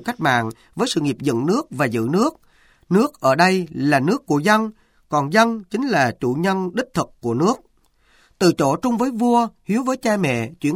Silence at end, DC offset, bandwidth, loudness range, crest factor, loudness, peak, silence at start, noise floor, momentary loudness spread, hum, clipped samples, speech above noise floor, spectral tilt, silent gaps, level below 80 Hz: 0 s; under 0.1%; 16.5 kHz; 3 LU; 18 dB; -20 LUFS; -2 dBFS; 0 s; -58 dBFS; 7 LU; none; under 0.1%; 39 dB; -5.5 dB/octave; none; -56 dBFS